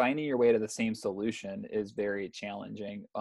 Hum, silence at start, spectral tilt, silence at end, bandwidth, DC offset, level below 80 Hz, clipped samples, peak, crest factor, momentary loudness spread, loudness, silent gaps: none; 0 s; -5 dB/octave; 0 s; 12 kHz; under 0.1%; -70 dBFS; under 0.1%; -14 dBFS; 18 dB; 13 LU; -32 LUFS; none